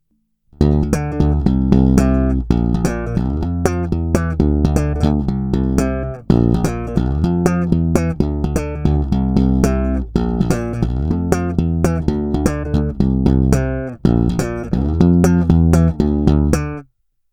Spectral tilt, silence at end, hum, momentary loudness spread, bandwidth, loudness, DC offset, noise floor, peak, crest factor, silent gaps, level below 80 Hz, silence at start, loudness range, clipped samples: -8 dB/octave; 0.5 s; none; 7 LU; 16 kHz; -17 LUFS; under 0.1%; -63 dBFS; 0 dBFS; 16 dB; none; -22 dBFS; 0.6 s; 3 LU; under 0.1%